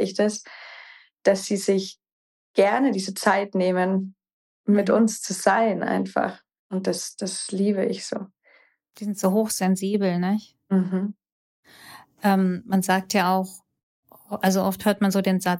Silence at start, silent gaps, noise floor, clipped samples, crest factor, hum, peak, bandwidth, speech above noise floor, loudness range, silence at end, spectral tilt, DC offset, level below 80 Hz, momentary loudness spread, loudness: 0 s; 2.12-2.54 s, 4.33-4.64 s, 6.59-6.70 s, 11.32-11.63 s, 13.83-14.03 s; -59 dBFS; under 0.1%; 18 dB; none; -6 dBFS; 17 kHz; 37 dB; 3 LU; 0 s; -5 dB/octave; under 0.1%; -70 dBFS; 12 LU; -23 LUFS